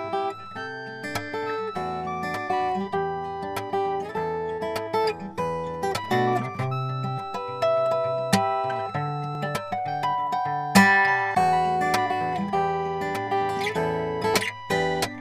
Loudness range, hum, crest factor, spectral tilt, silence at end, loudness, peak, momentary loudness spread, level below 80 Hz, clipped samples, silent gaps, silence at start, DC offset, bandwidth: 6 LU; none; 22 dB; -5 dB/octave; 0 s; -25 LUFS; -4 dBFS; 9 LU; -56 dBFS; under 0.1%; none; 0 s; under 0.1%; 15.5 kHz